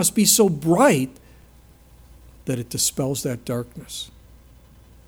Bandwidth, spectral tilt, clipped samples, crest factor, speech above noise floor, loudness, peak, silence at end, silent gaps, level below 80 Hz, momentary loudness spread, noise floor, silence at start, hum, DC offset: over 20 kHz; -4 dB/octave; under 0.1%; 20 dB; 29 dB; -20 LUFS; -2 dBFS; 1 s; none; -50 dBFS; 18 LU; -50 dBFS; 0 s; none; under 0.1%